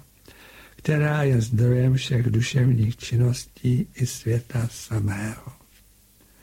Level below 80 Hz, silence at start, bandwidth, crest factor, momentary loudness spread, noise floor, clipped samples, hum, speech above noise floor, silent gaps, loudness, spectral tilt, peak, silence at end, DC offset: -48 dBFS; 0.55 s; 15.5 kHz; 16 dB; 8 LU; -56 dBFS; under 0.1%; none; 34 dB; none; -23 LUFS; -6.5 dB/octave; -6 dBFS; 0.9 s; under 0.1%